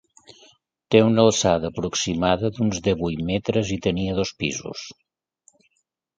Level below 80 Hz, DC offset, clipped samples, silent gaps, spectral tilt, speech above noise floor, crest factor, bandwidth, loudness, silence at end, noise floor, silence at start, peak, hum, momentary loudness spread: -46 dBFS; under 0.1%; under 0.1%; none; -5 dB/octave; 53 dB; 22 dB; 9.4 kHz; -22 LUFS; 1.25 s; -74 dBFS; 0.9 s; 0 dBFS; none; 10 LU